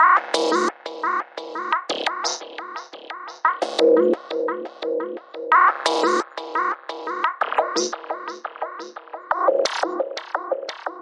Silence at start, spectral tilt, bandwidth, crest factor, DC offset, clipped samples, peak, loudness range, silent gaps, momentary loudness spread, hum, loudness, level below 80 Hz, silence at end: 0 s; -1.5 dB/octave; 11.5 kHz; 20 dB; under 0.1%; under 0.1%; -4 dBFS; 5 LU; none; 16 LU; none; -22 LUFS; -78 dBFS; 0 s